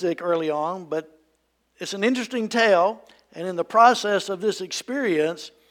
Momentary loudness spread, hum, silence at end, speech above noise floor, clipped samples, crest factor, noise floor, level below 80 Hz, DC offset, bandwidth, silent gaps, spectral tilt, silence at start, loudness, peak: 15 LU; none; 0.2 s; 46 dB; under 0.1%; 20 dB; -69 dBFS; -76 dBFS; under 0.1%; 16.5 kHz; none; -4 dB/octave; 0 s; -22 LUFS; -4 dBFS